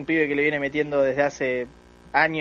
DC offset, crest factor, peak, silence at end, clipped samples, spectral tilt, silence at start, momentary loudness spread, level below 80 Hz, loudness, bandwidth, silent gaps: under 0.1%; 18 dB; -4 dBFS; 0 s; under 0.1%; -5.5 dB/octave; 0 s; 6 LU; -56 dBFS; -23 LUFS; 7.2 kHz; none